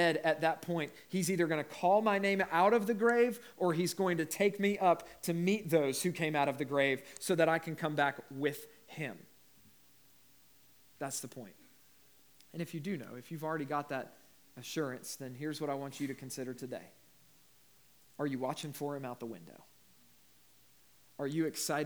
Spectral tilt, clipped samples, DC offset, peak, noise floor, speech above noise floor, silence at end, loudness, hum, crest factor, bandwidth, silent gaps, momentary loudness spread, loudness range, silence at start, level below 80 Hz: -5 dB/octave; under 0.1%; under 0.1%; -14 dBFS; -66 dBFS; 32 dB; 0 s; -34 LUFS; none; 20 dB; over 20 kHz; none; 15 LU; 14 LU; 0 s; -78 dBFS